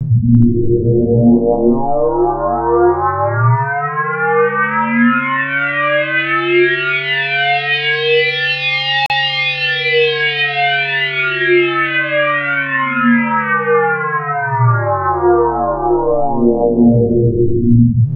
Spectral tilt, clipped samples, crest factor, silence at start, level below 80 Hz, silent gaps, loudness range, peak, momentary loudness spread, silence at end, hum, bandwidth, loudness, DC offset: -8 dB/octave; under 0.1%; 14 dB; 0 s; -34 dBFS; none; 1 LU; 0 dBFS; 4 LU; 0 s; none; 5.8 kHz; -13 LUFS; under 0.1%